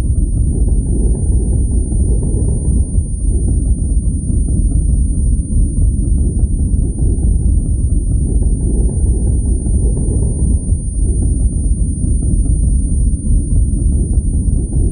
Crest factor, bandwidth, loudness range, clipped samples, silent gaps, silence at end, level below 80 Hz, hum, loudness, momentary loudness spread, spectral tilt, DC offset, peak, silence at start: 10 dB; 9.8 kHz; 0 LU; under 0.1%; none; 0 s; -14 dBFS; none; -16 LUFS; 2 LU; -10.5 dB/octave; under 0.1%; -2 dBFS; 0 s